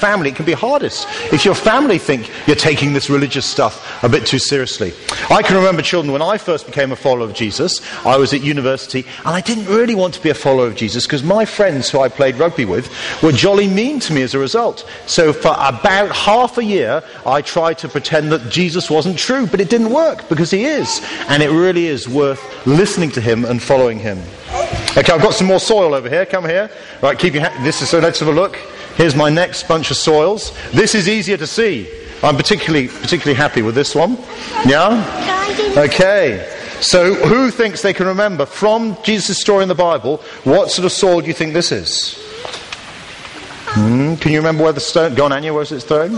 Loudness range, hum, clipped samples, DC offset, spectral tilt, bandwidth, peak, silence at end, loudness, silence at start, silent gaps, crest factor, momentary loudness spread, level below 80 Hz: 2 LU; none; under 0.1%; under 0.1%; -4.5 dB/octave; 11.5 kHz; 0 dBFS; 0 s; -14 LUFS; 0 s; none; 14 dB; 8 LU; -42 dBFS